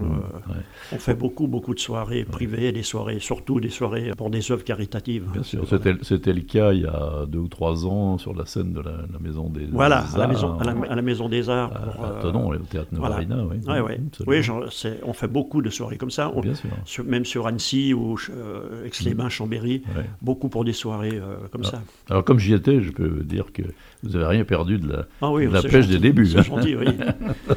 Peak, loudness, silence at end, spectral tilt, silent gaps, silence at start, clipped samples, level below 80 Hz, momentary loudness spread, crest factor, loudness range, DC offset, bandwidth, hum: 0 dBFS; -23 LUFS; 0 s; -6.5 dB/octave; none; 0 s; under 0.1%; -40 dBFS; 12 LU; 22 dB; 6 LU; under 0.1%; 16 kHz; none